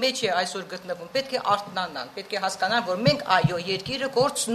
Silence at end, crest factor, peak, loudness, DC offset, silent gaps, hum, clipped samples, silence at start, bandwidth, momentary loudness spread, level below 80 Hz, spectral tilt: 0 s; 20 dB; -6 dBFS; -25 LUFS; under 0.1%; none; none; under 0.1%; 0 s; 13.5 kHz; 10 LU; -58 dBFS; -4 dB/octave